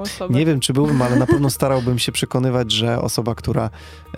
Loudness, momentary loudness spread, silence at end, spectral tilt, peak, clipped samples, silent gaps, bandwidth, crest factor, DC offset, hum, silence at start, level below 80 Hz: -18 LUFS; 6 LU; 0 s; -5.5 dB/octave; -2 dBFS; under 0.1%; none; 16 kHz; 18 dB; under 0.1%; none; 0 s; -40 dBFS